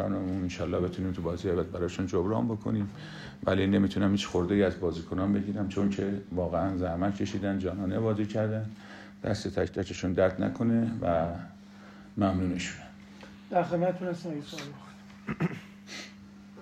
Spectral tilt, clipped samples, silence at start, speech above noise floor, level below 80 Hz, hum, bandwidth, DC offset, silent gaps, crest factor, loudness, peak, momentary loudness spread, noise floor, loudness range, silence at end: -7 dB/octave; under 0.1%; 0 s; 20 dB; -54 dBFS; none; 9.6 kHz; under 0.1%; none; 18 dB; -30 LUFS; -12 dBFS; 17 LU; -49 dBFS; 4 LU; 0 s